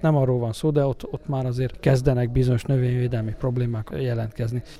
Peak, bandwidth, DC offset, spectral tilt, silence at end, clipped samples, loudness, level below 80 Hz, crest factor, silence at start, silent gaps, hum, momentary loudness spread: -6 dBFS; 12 kHz; under 0.1%; -8 dB/octave; 0 s; under 0.1%; -24 LUFS; -40 dBFS; 18 dB; 0 s; none; none; 7 LU